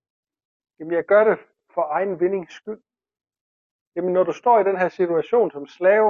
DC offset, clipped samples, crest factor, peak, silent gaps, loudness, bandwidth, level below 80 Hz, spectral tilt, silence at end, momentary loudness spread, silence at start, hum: under 0.1%; under 0.1%; 16 dB; -4 dBFS; 3.41-3.92 s; -21 LUFS; 7 kHz; -70 dBFS; -7.5 dB/octave; 0 s; 18 LU; 0.8 s; none